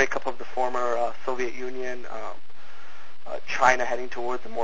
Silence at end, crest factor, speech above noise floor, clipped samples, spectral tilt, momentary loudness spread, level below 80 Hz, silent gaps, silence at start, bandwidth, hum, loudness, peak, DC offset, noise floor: 0 s; 24 dB; 22 dB; under 0.1%; -3.5 dB/octave; 26 LU; -60 dBFS; none; 0 s; 7.8 kHz; none; -27 LUFS; -4 dBFS; 7%; -50 dBFS